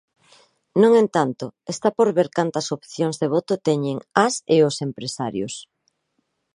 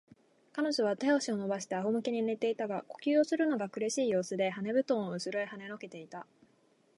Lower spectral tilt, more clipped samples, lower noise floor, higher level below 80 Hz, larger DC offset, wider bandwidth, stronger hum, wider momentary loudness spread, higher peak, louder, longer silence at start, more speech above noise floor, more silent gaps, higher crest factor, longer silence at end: about the same, -5 dB/octave vs -4.5 dB/octave; neither; about the same, -72 dBFS vs -69 dBFS; first, -66 dBFS vs -84 dBFS; neither; about the same, 11 kHz vs 11.5 kHz; neither; about the same, 12 LU vs 14 LU; first, 0 dBFS vs -16 dBFS; first, -21 LUFS vs -32 LUFS; first, 0.75 s vs 0.55 s; first, 52 dB vs 36 dB; neither; about the same, 20 dB vs 16 dB; first, 0.9 s vs 0.75 s